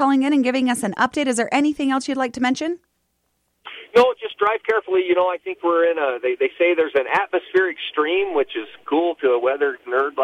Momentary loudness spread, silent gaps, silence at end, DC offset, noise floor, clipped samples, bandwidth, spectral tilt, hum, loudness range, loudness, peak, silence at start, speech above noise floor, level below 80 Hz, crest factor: 6 LU; none; 0 s; under 0.1%; -70 dBFS; under 0.1%; 13 kHz; -3.5 dB/octave; none; 2 LU; -20 LUFS; -4 dBFS; 0 s; 50 dB; -64 dBFS; 16 dB